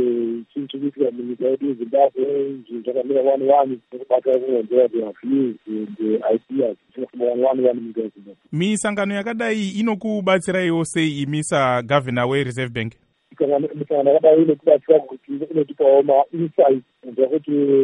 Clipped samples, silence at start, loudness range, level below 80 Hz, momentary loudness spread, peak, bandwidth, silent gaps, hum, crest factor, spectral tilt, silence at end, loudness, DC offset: under 0.1%; 0 s; 5 LU; -64 dBFS; 12 LU; -2 dBFS; 11 kHz; none; none; 18 dB; -6 dB/octave; 0 s; -20 LUFS; under 0.1%